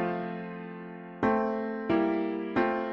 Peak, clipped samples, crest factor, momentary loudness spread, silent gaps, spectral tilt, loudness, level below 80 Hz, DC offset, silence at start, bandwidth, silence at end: -14 dBFS; under 0.1%; 16 dB; 14 LU; none; -8.5 dB/octave; -30 LUFS; -60 dBFS; under 0.1%; 0 s; 6 kHz; 0 s